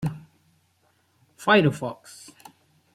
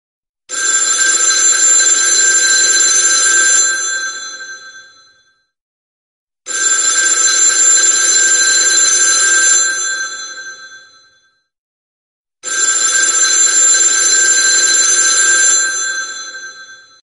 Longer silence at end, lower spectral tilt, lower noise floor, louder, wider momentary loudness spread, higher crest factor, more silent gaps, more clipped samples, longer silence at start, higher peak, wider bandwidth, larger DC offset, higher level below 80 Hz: first, 1 s vs 0.3 s; first, -6 dB/octave vs 4 dB/octave; first, -66 dBFS vs -56 dBFS; second, -23 LUFS vs -8 LUFS; first, 25 LU vs 16 LU; first, 22 dB vs 14 dB; second, none vs 5.61-6.27 s, 11.58-12.25 s; neither; second, 0 s vs 0.5 s; second, -4 dBFS vs 0 dBFS; first, 15 kHz vs 11.5 kHz; neither; first, -62 dBFS vs -68 dBFS